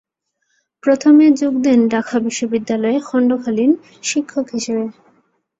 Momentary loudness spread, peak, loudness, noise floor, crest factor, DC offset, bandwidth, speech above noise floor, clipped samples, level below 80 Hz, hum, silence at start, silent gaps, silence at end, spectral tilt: 11 LU; -2 dBFS; -16 LUFS; -70 dBFS; 14 dB; under 0.1%; 8 kHz; 55 dB; under 0.1%; -62 dBFS; none; 0.85 s; none; 0.7 s; -4.5 dB/octave